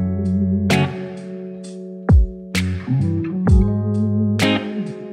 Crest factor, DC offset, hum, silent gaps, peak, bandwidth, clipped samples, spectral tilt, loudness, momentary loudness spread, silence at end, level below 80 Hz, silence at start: 16 dB; under 0.1%; none; none; -2 dBFS; 15.5 kHz; under 0.1%; -6.5 dB/octave; -19 LUFS; 15 LU; 0 s; -24 dBFS; 0 s